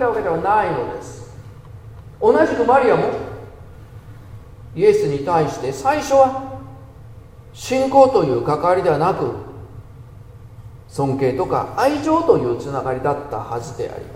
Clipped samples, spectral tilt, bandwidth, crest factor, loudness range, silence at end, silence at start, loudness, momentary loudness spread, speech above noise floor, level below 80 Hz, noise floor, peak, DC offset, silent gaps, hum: under 0.1%; -6.5 dB/octave; 15.5 kHz; 18 dB; 3 LU; 0 s; 0 s; -18 LUFS; 23 LU; 22 dB; -44 dBFS; -40 dBFS; 0 dBFS; under 0.1%; none; none